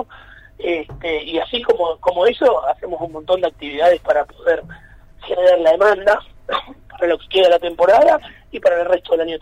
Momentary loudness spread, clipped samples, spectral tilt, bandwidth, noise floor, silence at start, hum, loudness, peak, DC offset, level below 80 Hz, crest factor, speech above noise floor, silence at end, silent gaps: 12 LU; under 0.1%; -4.5 dB/octave; 9.4 kHz; -42 dBFS; 0 s; none; -17 LUFS; -4 dBFS; under 0.1%; -46 dBFS; 12 dB; 26 dB; 0.05 s; none